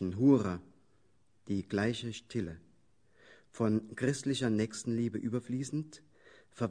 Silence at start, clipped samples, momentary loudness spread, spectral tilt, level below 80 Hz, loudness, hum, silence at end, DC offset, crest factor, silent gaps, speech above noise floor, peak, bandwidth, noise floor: 0 s; under 0.1%; 12 LU; -6 dB/octave; -66 dBFS; -34 LUFS; none; 0 s; under 0.1%; 20 dB; none; 40 dB; -14 dBFS; 10.5 kHz; -73 dBFS